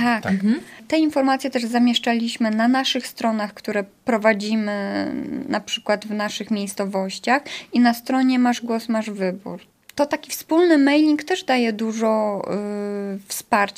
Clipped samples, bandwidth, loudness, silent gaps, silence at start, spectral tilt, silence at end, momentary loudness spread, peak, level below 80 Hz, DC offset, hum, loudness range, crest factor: under 0.1%; 15.5 kHz; -21 LUFS; none; 0 s; -4.5 dB/octave; 0.05 s; 8 LU; -2 dBFS; -66 dBFS; under 0.1%; none; 3 LU; 18 dB